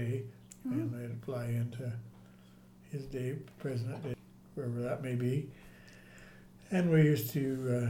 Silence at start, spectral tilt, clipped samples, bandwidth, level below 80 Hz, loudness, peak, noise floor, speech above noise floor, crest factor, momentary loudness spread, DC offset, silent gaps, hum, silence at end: 0 s; -7.5 dB/octave; under 0.1%; 16.5 kHz; -64 dBFS; -35 LUFS; -16 dBFS; -58 dBFS; 24 dB; 20 dB; 25 LU; under 0.1%; none; none; 0 s